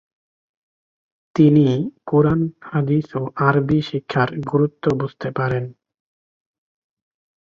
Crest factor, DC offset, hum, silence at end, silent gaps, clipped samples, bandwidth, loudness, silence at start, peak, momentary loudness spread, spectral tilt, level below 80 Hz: 18 dB; under 0.1%; none; 1.75 s; none; under 0.1%; 6.8 kHz; -19 LUFS; 1.35 s; -2 dBFS; 10 LU; -9 dB/octave; -52 dBFS